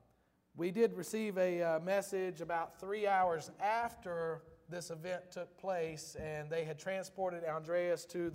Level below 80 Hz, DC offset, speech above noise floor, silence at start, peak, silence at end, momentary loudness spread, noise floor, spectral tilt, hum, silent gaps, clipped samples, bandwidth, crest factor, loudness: -70 dBFS; under 0.1%; 36 dB; 0.55 s; -20 dBFS; 0 s; 10 LU; -74 dBFS; -5 dB/octave; none; none; under 0.1%; 16 kHz; 18 dB; -38 LUFS